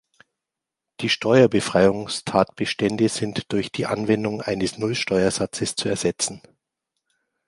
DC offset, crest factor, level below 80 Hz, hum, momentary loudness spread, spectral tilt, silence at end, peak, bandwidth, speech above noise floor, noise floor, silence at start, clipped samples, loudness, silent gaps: under 0.1%; 22 dB; -54 dBFS; none; 8 LU; -4.5 dB/octave; 1.1 s; -2 dBFS; 11.5 kHz; 64 dB; -86 dBFS; 1 s; under 0.1%; -22 LUFS; none